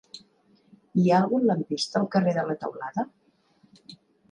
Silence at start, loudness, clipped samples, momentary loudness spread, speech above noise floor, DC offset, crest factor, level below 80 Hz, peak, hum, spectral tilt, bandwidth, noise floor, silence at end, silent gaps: 0.15 s; -25 LUFS; under 0.1%; 13 LU; 39 dB; under 0.1%; 18 dB; -72 dBFS; -10 dBFS; none; -6.5 dB/octave; 10 kHz; -63 dBFS; 0.4 s; none